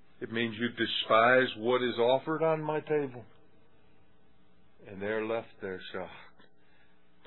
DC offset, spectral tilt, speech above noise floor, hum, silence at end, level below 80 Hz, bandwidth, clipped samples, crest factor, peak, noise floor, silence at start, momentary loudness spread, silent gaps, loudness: 0.2%; -2.5 dB/octave; 36 dB; none; 1.05 s; -74 dBFS; 4.2 kHz; under 0.1%; 22 dB; -10 dBFS; -66 dBFS; 0.2 s; 17 LU; none; -30 LUFS